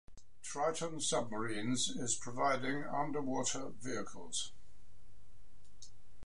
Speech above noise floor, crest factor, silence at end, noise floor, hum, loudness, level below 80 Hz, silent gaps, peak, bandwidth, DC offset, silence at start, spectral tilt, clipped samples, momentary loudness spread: 25 dB; 18 dB; 0 s; -63 dBFS; none; -38 LUFS; -66 dBFS; none; -22 dBFS; 11.5 kHz; 1%; 0.05 s; -3 dB/octave; under 0.1%; 13 LU